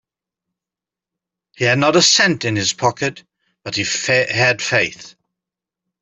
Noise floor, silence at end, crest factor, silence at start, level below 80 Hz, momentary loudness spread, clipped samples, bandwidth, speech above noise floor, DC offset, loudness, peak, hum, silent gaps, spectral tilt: -88 dBFS; 0.9 s; 18 dB; 1.6 s; -58 dBFS; 12 LU; under 0.1%; 8.4 kHz; 71 dB; under 0.1%; -16 LUFS; -2 dBFS; none; none; -3 dB/octave